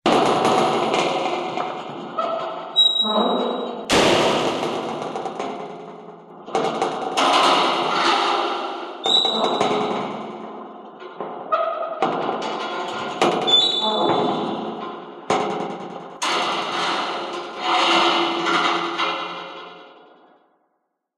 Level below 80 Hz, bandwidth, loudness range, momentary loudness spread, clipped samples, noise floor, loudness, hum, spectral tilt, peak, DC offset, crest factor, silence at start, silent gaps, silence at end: -60 dBFS; 13.5 kHz; 5 LU; 17 LU; under 0.1%; -73 dBFS; -20 LUFS; none; -3 dB/octave; -4 dBFS; under 0.1%; 18 dB; 0.05 s; none; 1.25 s